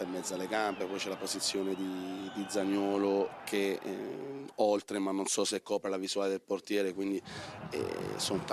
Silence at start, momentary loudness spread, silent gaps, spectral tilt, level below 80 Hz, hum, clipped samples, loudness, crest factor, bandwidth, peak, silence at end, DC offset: 0 s; 9 LU; none; -3.5 dB/octave; -72 dBFS; none; under 0.1%; -34 LUFS; 18 dB; 14.5 kHz; -16 dBFS; 0 s; under 0.1%